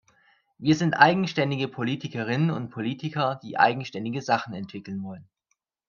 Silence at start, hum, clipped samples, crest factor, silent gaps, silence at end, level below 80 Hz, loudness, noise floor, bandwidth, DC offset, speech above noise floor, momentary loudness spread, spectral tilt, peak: 0.6 s; none; under 0.1%; 26 dB; none; 0.65 s; -68 dBFS; -25 LUFS; -77 dBFS; 7.2 kHz; under 0.1%; 51 dB; 16 LU; -6 dB/octave; 0 dBFS